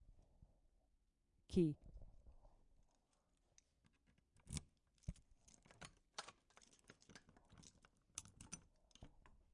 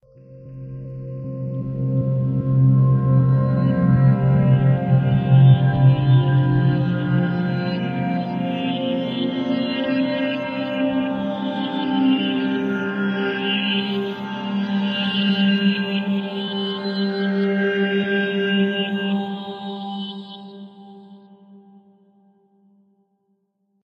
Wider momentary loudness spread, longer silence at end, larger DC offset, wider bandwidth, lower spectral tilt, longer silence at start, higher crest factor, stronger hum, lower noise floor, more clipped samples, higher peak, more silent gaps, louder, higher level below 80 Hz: first, 26 LU vs 13 LU; second, 0.45 s vs 2.25 s; neither; first, 11 kHz vs 5 kHz; second, -5.5 dB/octave vs -9.5 dB/octave; second, 0.1 s vs 0.3 s; first, 26 dB vs 18 dB; neither; first, -82 dBFS vs -69 dBFS; neither; second, -26 dBFS vs -2 dBFS; neither; second, -48 LUFS vs -20 LUFS; second, -66 dBFS vs -50 dBFS